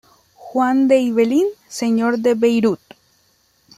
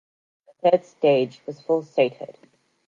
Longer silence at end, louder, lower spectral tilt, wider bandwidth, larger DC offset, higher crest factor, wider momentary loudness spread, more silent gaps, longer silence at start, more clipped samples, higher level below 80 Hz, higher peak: first, 1.05 s vs 0.55 s; first, -17 LUFS vs -22 LUFS; second, -5.5 dB/octave vs -7 dB/octave; first, 14.5 kHz vs 7.4 kHz; neither; about the same, 16 dB vs 18 dB; second, 9 LU vs 16 LU; neither; second, 0.4 s vs 0.65 s; neither; first, -64 dBFS vs -80 dBFS; about the same, -4 dBFS vs -6 dBFS